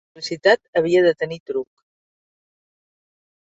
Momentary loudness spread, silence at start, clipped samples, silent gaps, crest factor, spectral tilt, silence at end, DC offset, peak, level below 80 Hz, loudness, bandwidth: 12 LU; 0.15 s; under 0.1%; 0.68-0.73 s, 1.40-1.46 s; 20 dB; -5 dB/octave; 1.8 s; under 0.1%; -2 dBFS; -64 dBFS; -19 LUFS; 8 kHz